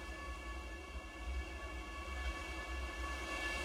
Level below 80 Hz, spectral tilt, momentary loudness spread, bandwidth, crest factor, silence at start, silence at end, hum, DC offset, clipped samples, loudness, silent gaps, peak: -46 dBFS; -4 dB/octave; 6 LU; 15 kHz; 16 dB; 0 s; 0 s; none; under 0.1%; under 0.1%; -45 LUFS; none; -28 dBFS